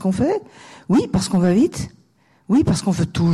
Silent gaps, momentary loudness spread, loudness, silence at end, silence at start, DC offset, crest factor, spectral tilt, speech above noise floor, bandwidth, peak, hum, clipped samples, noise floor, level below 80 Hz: none; 12 LU; -19 LUFS; 0 s; 0 s; under 0.1%; 12 dB; -6.5 dB/octave; 39 dB; 13 kHz; -8 dBFS; none; under 0.1%; -57 dBFS; -42 dBFS